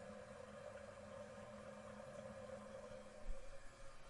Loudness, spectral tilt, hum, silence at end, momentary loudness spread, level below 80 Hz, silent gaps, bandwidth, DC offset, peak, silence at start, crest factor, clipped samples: -56 LUFS; -5 dB/octave; none; 0 s; 3 LU; -60 dBFS; none; 11.5 kHz; under 0.1%; -34 dBFS; 0 s; 18 dB; under 0.1%